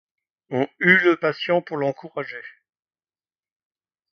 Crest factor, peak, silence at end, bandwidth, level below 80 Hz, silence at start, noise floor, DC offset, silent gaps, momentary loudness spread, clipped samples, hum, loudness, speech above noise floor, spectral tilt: 24 dB; 0 dBFS; 1.65 s; 6.4 kHz; -70 dBFS; 0.5 s; under -90 dBFS; under 0.1%; none; 16 LU; under 0.1%; none; -20 LUFS; over 69 dB; -7 dB/octave